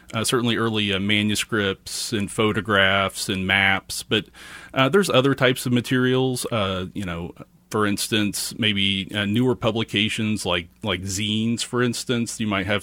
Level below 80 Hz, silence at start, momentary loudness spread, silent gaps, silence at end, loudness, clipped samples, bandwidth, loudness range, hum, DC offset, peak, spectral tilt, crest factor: -54 dBFS; 0.1 s; 9 LU; none; 0 s; -22 LUFS; under 0.1%; 17 kHz; 3 LU; none; under 0.1%; -2 dBFS; -4 dB/octave; 20 dB